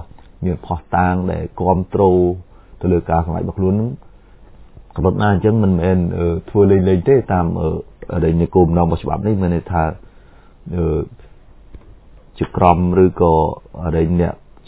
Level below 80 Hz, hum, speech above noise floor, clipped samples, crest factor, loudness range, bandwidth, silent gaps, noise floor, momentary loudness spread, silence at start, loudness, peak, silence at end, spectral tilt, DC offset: -30 dBFS; none; 28 dB; under 0.1%; 16 dB; 5 LU; 4 kHz; none; -44 dBFS; 11 LU; 0 s; -17 LUFS; 0 dBFS; 0.3 s; -13 dB/octave; under 0.1%